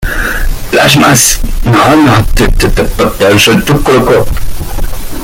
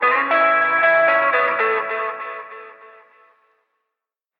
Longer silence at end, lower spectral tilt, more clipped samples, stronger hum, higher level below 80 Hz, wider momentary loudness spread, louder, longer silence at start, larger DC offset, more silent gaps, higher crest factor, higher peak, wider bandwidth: second, 0 s vs 1.5 s; second, -4 dB/octave vs -5.5 dB/octave; first, 0.3% vs under 0.1%; neither; first, -14 dBFS vs -76 dBFS; second, 14 LU vs 18 LU; first, -7 LUFS vs -16 LUFS; about the same, 0 s vs 0 s; neither; neither; second, 8 dB vs 16 dB; first, 0 dBFS vs -4 dBFS; first, 17.5 kHz vs 5.4 kHz